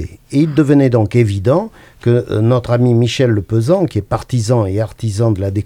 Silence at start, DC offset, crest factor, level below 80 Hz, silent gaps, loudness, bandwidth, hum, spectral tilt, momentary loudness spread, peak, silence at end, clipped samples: 0 s; under 0.1%; 14 dB; -42 dBFS; none; -14 LUFS; 11 kHz; none; -7.5 dB/octave; 8 LU; 0 dBFS; 0 s; under 0.1%